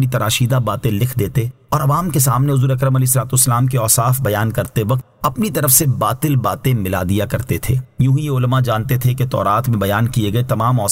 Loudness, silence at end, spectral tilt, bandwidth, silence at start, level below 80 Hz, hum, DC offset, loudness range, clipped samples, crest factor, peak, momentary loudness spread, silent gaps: -16 LUFS; 0 s; -5 dB/octave; 16.5 kHz; 0 s; -40 dBFS; none; under 0.1%; 2 LU; under 0.1%; 16 dB; 0 dBFS; 6 LU; none